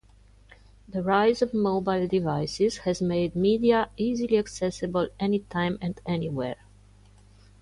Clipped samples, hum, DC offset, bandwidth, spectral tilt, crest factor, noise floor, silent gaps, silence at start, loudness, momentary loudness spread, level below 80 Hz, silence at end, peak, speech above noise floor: under 0.1%; 50 Hz at -50 dBFS; under 0.1%; 11.5 kHz; -6.5 dB/octave; 18 dB; -55 dBFS; none; 0.9 s; -26 LUFS; 9 LU; -52 dBFS; 1.05 s; -10 dBFS; 30 dB